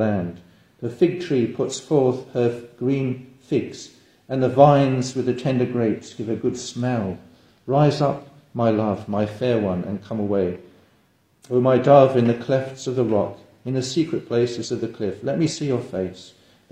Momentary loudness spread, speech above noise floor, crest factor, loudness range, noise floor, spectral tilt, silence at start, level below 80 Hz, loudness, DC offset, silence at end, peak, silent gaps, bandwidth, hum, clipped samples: 13 LU; 40 dB; 22 dB; 4 LU; -61 dBFS; -7 dB/octave; 0 s; -58 dBFS; -22 LUFS; under 0.1%; 0.45 s; 0 dBFS; none; 10.5 kHz; none; under 0.1%